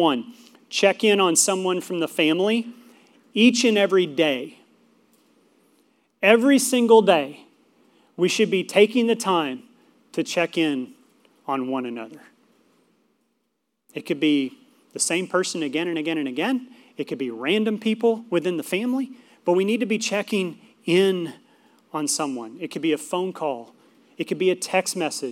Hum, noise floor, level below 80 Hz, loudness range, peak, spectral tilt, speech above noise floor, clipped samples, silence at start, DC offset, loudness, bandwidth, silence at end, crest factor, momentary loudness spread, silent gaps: none; -75 dBFS; -86 dBFS; 8 LU; -2 dBFS; -3.5 dB/octave; 54 dB; under 0.1%; 0 s; under 0.1%; -22 LUFS; 17 kHz; 0 s; 22 dB; 16 LU; none